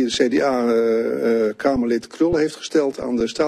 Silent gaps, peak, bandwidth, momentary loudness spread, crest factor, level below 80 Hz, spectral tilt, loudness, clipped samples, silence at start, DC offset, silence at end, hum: none; -4 dBFS; 13 kHz; 5 LU; 16 dB; -46 dBFS; -4.5 dB/octave; -20 LUFS; under 0.1%; 0 s; under 0.1%; 0 s; none